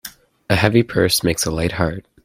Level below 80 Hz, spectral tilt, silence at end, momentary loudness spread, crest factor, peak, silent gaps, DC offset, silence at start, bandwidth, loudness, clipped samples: -40 dBFS; -4.5 dB/octave; 0.25 s; 7 LU; 18 dB; 0 dBFS; none; under 0.1%; 0.05 s; 16.5 kHz; -18 LUFS; under 0.1%